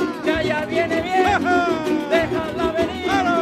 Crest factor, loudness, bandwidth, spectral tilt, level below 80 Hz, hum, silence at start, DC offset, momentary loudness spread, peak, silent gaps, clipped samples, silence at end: 14 dB; -20 LUFS; 14.5 kHz; -5 dB/octave; -44 dBFS; none; 0 s; under 0.1%; 4 LU; -4 dBFS; none; under 0.1%; 0 s